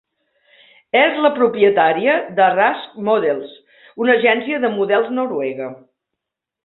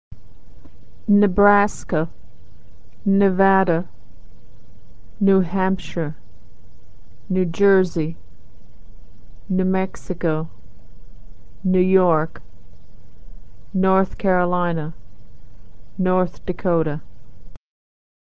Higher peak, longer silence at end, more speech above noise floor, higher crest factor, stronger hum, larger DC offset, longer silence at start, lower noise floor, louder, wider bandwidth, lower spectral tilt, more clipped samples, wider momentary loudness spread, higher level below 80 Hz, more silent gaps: about the same, -2 dBFS vs 0 dBFS; first, 0.9 s vs 0.6 s; first, 65 dB vs 27 dB; about the same, 16 dB vs 20 dB; neither; second, under 0.1% vs 5%; first, 0.95 s vs 0.1 s; first, -81 dBFS vs -46 dBFS; first, -16 LUFS vs -20 LUFS; second, 4.2 kHz vs 8 kHz; first, -9.5 dB/octave vs -8 dB/octave; neither; second, 10 LU vs 13 LU; second, -66 dBFS vs -42 dBFS; neither